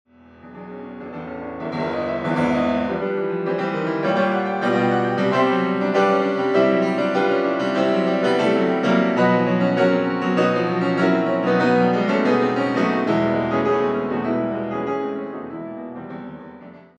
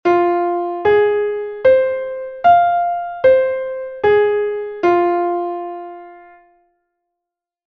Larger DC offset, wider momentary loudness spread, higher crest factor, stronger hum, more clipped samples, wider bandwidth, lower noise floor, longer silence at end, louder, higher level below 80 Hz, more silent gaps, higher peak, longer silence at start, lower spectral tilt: neither; about the same, 15 LU vs 13 LU; about the same, 16 dB vs 14 dB; neither; neither; first, 9.4 kHz vs 6.2 kHz; second, -44 dBFS vs -83 dBFS; second, 0.2 s vs 1.5 s; second, -20 LUFS vs -16 LUFS; about the same, -58 dBFS vs -54 dBFS; neither; about the same, -4 dBFS vs -2 dBFS; first, 0.45 s vs 0.05 s; about the same, -7 dB/octave vs -7 dB/octave